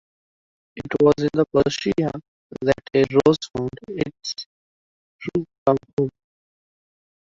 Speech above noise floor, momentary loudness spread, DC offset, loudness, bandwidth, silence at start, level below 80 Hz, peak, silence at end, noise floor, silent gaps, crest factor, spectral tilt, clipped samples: over 69 dB; 16 LU; under 0.1%; -22 LUFS; 7.6 kHz; 0.75 s; -52 dBFS; -4 dBFS; 1.1 s; under -90 dBFS; 2.28-2.50 s, 4.46-5.19 s, 5.58-5.66 s, 5.93-5.97 s; 20 dB; -6 dB/octave; under 0.1%